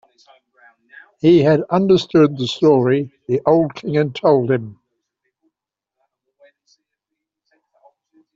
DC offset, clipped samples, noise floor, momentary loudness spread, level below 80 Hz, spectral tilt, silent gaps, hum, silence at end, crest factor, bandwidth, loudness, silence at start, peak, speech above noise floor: under 0.1%; under 0.1%; -83 dBFS; 8 LU; -60 dBFS; -7.5 dB/octave; none; none; 3.6 s; 16 dB; 7.6 kHz; -16 LUFS; 1.25 s; -2 dBFS; 68 dB